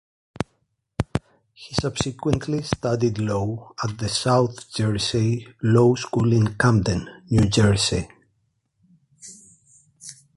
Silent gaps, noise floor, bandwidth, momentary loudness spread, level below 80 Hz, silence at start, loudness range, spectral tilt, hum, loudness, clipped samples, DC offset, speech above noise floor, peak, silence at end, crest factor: none; -71 dBFS; 11.5 kHz; 15 LU; -42 dBFS; 0.4 s; 6 LU; -5.5 dB/octave; none; -22 LUFS; under 0.1%; under 0.1%; 49 dB; -2 dBFS; 0.25 s; 22 dB